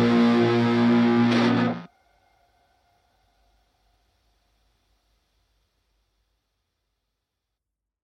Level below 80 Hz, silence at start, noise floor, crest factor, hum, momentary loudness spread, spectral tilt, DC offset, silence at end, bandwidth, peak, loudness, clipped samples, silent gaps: -66 dBFS; 0 s; -85 dBFS; 16 dB; none; 6 LU; -7 dB/octave; under 0.1%; 6.15 s; 7.4 kHz; -10 dBFS; -20 LUFS; under 0.1%; none